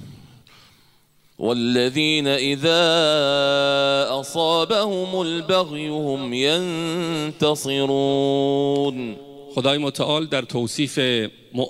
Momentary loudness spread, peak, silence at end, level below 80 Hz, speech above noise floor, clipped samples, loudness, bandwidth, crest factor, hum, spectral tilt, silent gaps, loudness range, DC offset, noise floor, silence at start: 8 LU; -4 dBFS; 0 s; -64 dBFS; 38 dB; under 0.1%; -20 LUFS; 16 kHz; 16 dB; none; -4.5 dB/octave; none; 4 LU; under 0.1%; -59 dBFS; 0 s